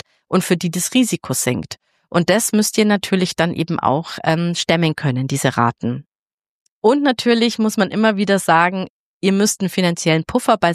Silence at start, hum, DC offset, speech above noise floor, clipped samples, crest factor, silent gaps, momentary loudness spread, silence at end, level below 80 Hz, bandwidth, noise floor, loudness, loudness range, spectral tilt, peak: 0.3 s; none; under 0.1%; over 73 dB; under 0.1%; 16 dB; 6.08-6.12 s, 6.19-6.26 s, 6.33-6.38 s, 6.48-6.82 s, 8.90-9.21 s; 6 LU; 0 s; -54 dBFS; 15 kHz; under -90 dBFS; -17 LUFS; 2 LU; -4.5 dB/octave; -2 dBFS